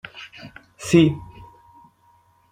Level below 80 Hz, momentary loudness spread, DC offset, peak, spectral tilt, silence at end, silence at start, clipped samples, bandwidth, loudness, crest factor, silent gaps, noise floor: -52 dBFS; 26 LU; under 0.1%; -2 dBFS; -6 dB/octave; 1.3 s; 0.15 s; under 0.1%; 15 kHz; -18 LUFS; 22 dB; none; -59 dBFS